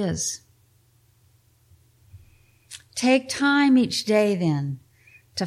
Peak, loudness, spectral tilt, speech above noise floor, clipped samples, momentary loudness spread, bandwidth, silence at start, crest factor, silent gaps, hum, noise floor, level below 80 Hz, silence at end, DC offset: -8 dBFS; -22 LUFS; -4.5 dB/octave; 39 dB; under 0.1%; 19 LU; 14.5 kHz; 0 s; 18 dB; none; none; -60 dBFS; -58 dBFS; 0 s; under 0.1%